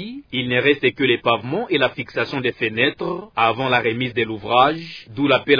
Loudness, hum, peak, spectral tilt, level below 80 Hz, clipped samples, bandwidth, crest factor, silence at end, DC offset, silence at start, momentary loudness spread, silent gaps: -19 LUFS; none; -2 dBFS; -7 dB/octave; -56 dBFS; under 0.1%; 5.4 kHz; 18 dB; 0 s; under 0.1%; 0 s; 9 LU; none